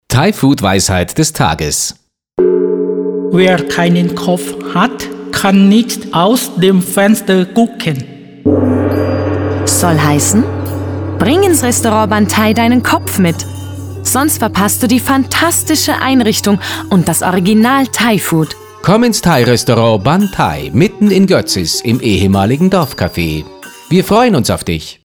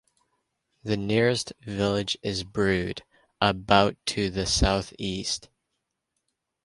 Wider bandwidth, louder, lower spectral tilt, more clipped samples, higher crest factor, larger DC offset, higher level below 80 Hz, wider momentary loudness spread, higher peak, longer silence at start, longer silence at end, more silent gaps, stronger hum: first, over 20 kHz vs 11.5 kHz; first, -11 LUFS vs -26 LUFS; about the same, -4.5 dB/octave vs -4.5 dB/octave; neither; second, 10 dB vs 24 dB; neither; about the same, -38 dBFS vs -42 dBFS; second, 8 LU vs 11 LU; first, 0 dBFS vs -4 dBFS; second, 0.1 s vs 0.85 s; second, 0.15 s vs 1.25 s; neither; neither